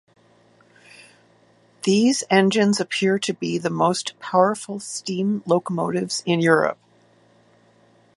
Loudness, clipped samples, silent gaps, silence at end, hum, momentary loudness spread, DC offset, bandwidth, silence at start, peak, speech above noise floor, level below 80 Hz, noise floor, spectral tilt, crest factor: -21 LUFS; under 0.1%; none; 1.45 s; none; 9 LU; under 0.1%; 11.5 kHz; 1.85 s; -2 dBFS; 36 dB; -68 dBFS; -57 dBFS; -4.5 dB/octave; 20 dB